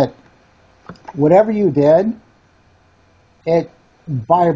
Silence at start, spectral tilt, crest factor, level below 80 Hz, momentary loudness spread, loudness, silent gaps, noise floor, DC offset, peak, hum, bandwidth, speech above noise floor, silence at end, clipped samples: 0 s; -9 dB/octave; 16 dB; -54 dBFS; 20 LU; -15 LUFS; none; -53 dBFS; under 0.1%; 0 dBFS; none; 7.6 kHz; 39 dB; 0 s; under 0.1%